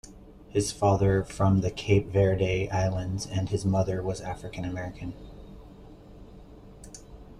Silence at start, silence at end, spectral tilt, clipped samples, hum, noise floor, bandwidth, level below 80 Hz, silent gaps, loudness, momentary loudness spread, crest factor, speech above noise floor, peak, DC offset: 0.05 s; 0 s; -6.5 dB/octave; under 0.1%; none; -48 dBFS; 12 kHz; -46 dBFS; none; -27 LUFS; 22 LU; 18 dB; 22 dB; -10 dBFS; under 0.1%